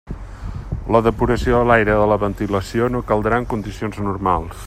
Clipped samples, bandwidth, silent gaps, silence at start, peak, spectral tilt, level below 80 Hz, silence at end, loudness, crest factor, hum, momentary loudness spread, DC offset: under 0.1%; 15.5 kHz; none; 0.05 s; 0 dBFS; -7 dB/octave; -32 dBFS; 0 s; -18 LUFS; 18 dB; none; 14 LU; under 0.1%